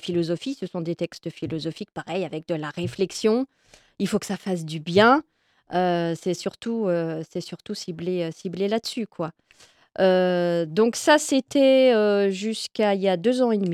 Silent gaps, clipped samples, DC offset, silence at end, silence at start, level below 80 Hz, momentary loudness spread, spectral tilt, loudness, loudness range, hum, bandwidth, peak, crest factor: none; under 0.1%; under 0.1%; 0 s; 0.05 s; -64 dBFS; 13 LU; -5 dB/octave; -24 LUFS; 8 LU; none; 14.5 kHz; -6 dBFS; 18 dB